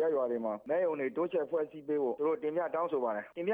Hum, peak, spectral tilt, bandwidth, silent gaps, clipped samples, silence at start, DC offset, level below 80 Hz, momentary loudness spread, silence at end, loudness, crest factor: none; -20 dBFS; -8.5 dB/octave; 3.7 kHz; none; under 0.1%; 0 s; under 0.1%; -82 dBFS; 4 LU; 0 s; -33 LUFS; 12 dB